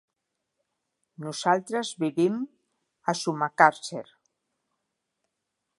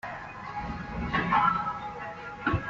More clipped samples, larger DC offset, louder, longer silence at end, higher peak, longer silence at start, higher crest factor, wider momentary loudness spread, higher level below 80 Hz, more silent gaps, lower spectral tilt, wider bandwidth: neither; neither; first, -26 LUFS vs -30 LUFS; first, 1.75 s vs 0 s; first, -2 dBFS vs -12 dBFS; first, 1.2 s vs 0.05 s; first, 26 dB vs 18 dB; first, 17 LU vs 14 LU; second, -82 dBFS vs -46 dBFS; neither; about the same, -4.5 dB/octave vs -4 dB/octave; first, 11.5 kHz vs 7.8 kHz